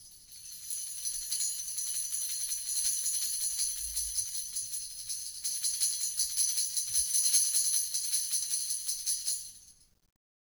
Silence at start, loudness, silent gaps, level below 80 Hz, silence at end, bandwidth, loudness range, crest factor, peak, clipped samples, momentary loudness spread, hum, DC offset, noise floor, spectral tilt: 0 s; -30 LUFS; none; -62 dBFS; 0.75 s; over 20 kHz; 4 LU; 22 dB; -12 dBFS; under 0.1%; 11 LU; none; under 0.1%; -58 dBFS; 4 dB/octave